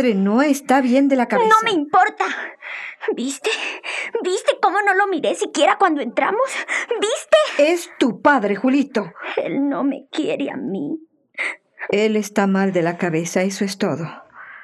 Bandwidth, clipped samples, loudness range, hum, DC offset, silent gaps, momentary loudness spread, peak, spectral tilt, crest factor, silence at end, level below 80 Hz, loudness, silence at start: 13.5 kHz; under 0.1%; 4 LU; none; under 0.1%; none; 10 LU; -2 dBFS; -4.5 dB/octave; 18 dB; 0 s; -72 dBFS; -19 LUFS; 0 s